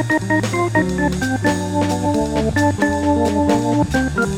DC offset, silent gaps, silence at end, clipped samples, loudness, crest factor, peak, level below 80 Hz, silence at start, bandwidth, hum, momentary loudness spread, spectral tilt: under 0.1%; none; 0 s; under 0.1%; -18 LUFS; 14 dB; -4 dBFS; -36 dBFS; 0 s; 16 kHz; none; 2 LU; -6 dB/octave